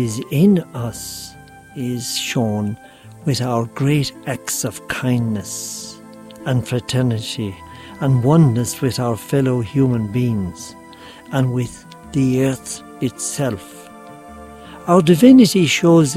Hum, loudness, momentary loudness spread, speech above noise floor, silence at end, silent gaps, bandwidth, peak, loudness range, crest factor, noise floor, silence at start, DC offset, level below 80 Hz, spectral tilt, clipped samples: none; -18 LUFS; 23 LU; 23 dB; 0 s; none; 15.5 kHz; 0 dBFS; 6 LU; 18 dB; -39 dBFS; 0 s; under 0.1%; -50 dBFS; -5.5 dB/octave; under 0.1%